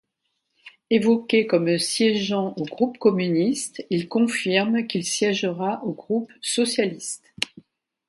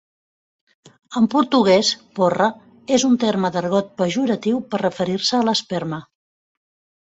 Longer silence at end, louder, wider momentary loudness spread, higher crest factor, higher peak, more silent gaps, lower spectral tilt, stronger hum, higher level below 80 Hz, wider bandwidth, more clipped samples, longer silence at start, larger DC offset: second, 0.65 s vs 1.05 s; second, -23 LUFS vs -19 LUFS; about the same, 9 LU vs 10 LU; about the same, 20 dB vs 18 dB; about the same, -2 dBFS vs -4 dBFS; neither; about the same, -4 dB/octave vs -4.5 dB/octave; neither; second, -70 dBFS vs -60 dBFS; first, 11.5 kHz vs 8.2 kHz; neither; second, 0.65 s vs 1.1 s; neither